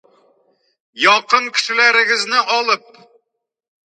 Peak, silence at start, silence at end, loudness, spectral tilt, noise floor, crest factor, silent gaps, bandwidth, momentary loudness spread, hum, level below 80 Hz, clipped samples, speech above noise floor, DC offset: 0 dBFS; 0.95 s; 1.1 s; -14 LUFS; 0 dB/octave; -77 dBFS; 18 dB; none; 10.5 kHz; 6 LU; none; -80 dBFS; under 0.1%; 61 dB; under 0.1%